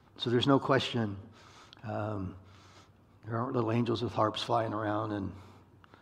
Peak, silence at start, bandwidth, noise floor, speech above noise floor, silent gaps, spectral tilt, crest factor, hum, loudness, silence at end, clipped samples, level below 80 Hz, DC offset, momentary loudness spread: -10 dBFS; 0.2 s; 11 kHz; -59 dBFS; 28 dB; none; -6.5 dB/octave; 22 dB; none; -32 LUFS; 0.45 s; under 0.1%; -68 dBFS; under 0.1%; 16 LU